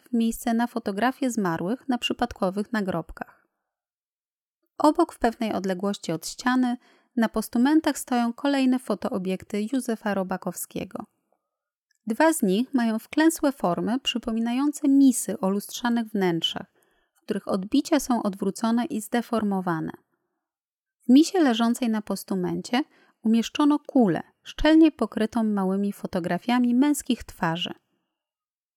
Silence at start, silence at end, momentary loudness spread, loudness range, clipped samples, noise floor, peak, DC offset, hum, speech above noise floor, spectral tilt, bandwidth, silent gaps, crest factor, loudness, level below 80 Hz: 0.1 s; 1.05 s; 10 LU; 5 LU; under 0.1%; under -90 dBFS; -6 dBFS; under 0.1%; none; over 66 dB; -5 dB/octave; 17.5 kHz; 3.94-4.02 s, 4.09-4.59 s, 11.76-11.89 s, 20.69-20.84 s; 18 dB; -25 LUFS; -52 dBFS